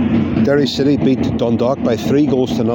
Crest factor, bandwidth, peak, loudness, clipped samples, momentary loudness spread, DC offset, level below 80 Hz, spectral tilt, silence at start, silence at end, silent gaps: 10 dB; 17 kHz; -4 dBFS; -15 LUFS; under 0.1%; 2 LU; under 0.1%; -40 dBFS; -7 dB/octave; 0 s; 0 s; none